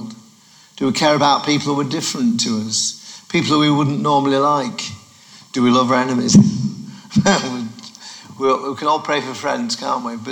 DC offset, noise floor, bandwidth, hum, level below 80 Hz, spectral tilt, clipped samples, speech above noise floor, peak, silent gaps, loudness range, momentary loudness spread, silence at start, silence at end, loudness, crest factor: under 0.1%; -48 dBFS; 18 kHz; none; -54 dBFS; -4.5 dB/octave; under 0.1%; 32 dB; 0 dBFS; none; 3 LU; 14 LU; 0 s; 0 s; -17 LUFS; 18 dB